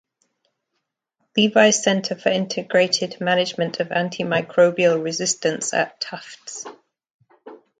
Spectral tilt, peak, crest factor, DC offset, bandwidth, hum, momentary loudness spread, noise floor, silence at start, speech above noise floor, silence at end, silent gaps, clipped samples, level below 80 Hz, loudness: -3.5 dB/octave; 0 dBFS; 20 dB; under 0.1%; 9.4 kHz; none; 16 LU; -78 dBFS; 1.35 s; 57 dB; 0.25 s; 7.14-7.19 s; under 0.1%; -68 dBFS; -20 LUFS